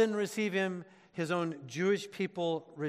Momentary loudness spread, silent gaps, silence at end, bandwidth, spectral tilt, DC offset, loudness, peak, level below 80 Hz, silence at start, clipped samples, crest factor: 7 LU; none; 0 s; 14 kHz; -5.5 dB/octave; under 0.1%; -34 LUFS; -16 dBFS; -82 dBFS; 0 s; under 0.1%; 18 dB